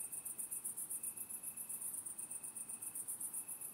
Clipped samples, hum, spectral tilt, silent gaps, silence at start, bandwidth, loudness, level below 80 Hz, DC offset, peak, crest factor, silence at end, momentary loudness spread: under 0.1%; none; -0.5 dB/octave; none; 0 s; 16 kHz; -43 LUFS; -88 dBFS; under 0.1%; -30 dBFS; 16 dB; 0 s; 3 LU